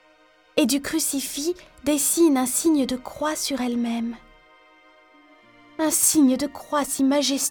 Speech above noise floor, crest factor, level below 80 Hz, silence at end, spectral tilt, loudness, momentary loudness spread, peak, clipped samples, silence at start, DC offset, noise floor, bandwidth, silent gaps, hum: 34 dB; 18 dB; -56 dBFS; 0 s; -2 dB/octave; -22 LUFS; 10 LU; -4 dBFS; under 0.1%; 0.55 s; under 0.1%; -57 dBFS; 19 kHz; none; 50 Hz at -75 dBFS